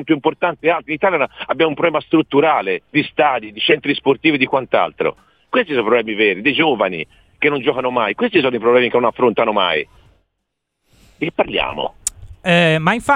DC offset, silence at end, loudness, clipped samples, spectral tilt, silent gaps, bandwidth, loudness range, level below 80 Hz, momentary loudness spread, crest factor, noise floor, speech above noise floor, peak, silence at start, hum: under 0.1%; 0 s; -16 LUFS; under 0.1%; -4.5 dB/octave; none; 15.5 kHz; 3 LU; -50 dBFS; 8 LU; 16 dB; -75 dBFS; 59 dB; 0 dBFS; 0 s; none